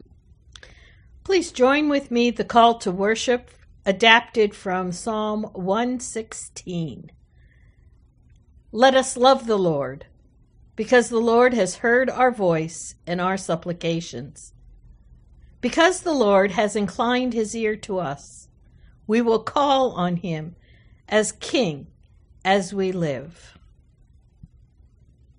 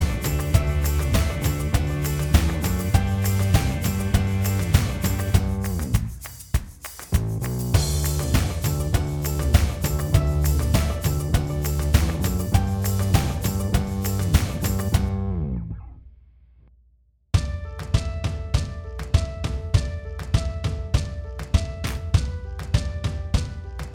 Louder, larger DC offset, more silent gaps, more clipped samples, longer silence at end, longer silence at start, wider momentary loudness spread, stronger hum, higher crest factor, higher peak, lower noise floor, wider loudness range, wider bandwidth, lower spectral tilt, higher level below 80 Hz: first, -21 LUFS vs -24 LUFS; neither; neither; neither; first, 2.05 s vs 0 s; first, 1.25 s vs 0 s; first, 15 LU vs 8 LU; neither; about the same, 22 dB vs 20 dB; about the same, 0 dBFS vs -2 dBFS; second, -55 dBFS vs -60 dBFS; first, 8 LU vs 5 LU; second, 10.5 kHz vs 20 kHz; about the same, -4.5 dB/octave vs -5.5 dB/octave; second, -52 dBFS vs -28 dBFS